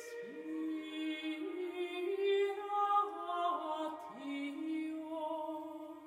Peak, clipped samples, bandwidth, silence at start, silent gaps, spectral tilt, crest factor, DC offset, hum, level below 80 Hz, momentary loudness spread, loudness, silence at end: -22 dBFS; under 0.1%; 15.5 kHz; 0 s; none; -3.5 dB/octave; 16 dB; under 0.1%; none; -88 dBFS; 11 LU; -38 LUFS; 0 s